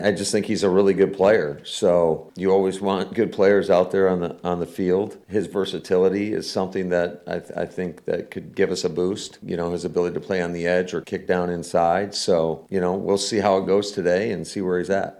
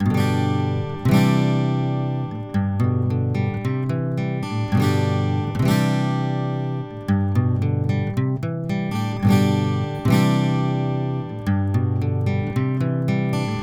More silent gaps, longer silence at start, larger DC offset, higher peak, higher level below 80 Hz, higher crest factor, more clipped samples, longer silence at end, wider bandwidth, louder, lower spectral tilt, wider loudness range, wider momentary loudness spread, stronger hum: neither; about the same, 0 s vs 0 s; second, under 0.1% vs 0.1%; about the same, -6 dBFS vs -4 dBFS; second, -58 dBFS vs -48 dBFS; about the same, 16 dB vs 16 dB; neither; about the same, 0.05 s vs 0 s; second, 13 kHz vs 15 kHz; about the same, -22 LUFS vs -21 LUFS; second, -5 dB/octave vs -7.5 dB/octave; first, 6 LU vs 2 LU; about the same, 9 LU vs 7 LU; neither